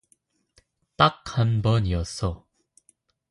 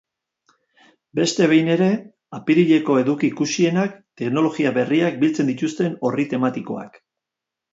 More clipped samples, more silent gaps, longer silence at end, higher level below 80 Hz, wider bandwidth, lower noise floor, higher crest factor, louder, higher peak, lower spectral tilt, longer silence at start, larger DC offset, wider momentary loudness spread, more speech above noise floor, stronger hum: neither; neither; about the same, 0.95 s vs 0.85 s; first, -40 dBFS vs -68 dBFS; first, 11.5 kHz vs 8 kHz; second, -67 dBFS vs -85 dBFS; first, 24 dB vs 16 dB; second, -24 LUFS vs -20 LUFS; about the same, -2 dBFS vs -4 dBFS; about the same, -6 dB/octave vs -5.5 dB/octave; second, 1 s vs 1.15 s; neither; second, 9 LU vs 13 LU; second, 44 dB vs 66 dB; neither